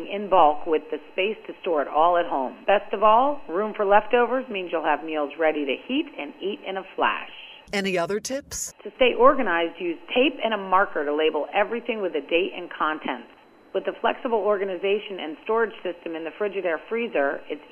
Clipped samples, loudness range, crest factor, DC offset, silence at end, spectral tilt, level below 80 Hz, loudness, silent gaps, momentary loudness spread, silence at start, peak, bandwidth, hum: under 0.1%; 5 LU; 20 dB; under 0.1%; 0.05 s; -3.5 dB/octave; -56 dBFS; -24 LUFS; none; 13 LU; 0 s; -4 dBFS; 13 kHz; none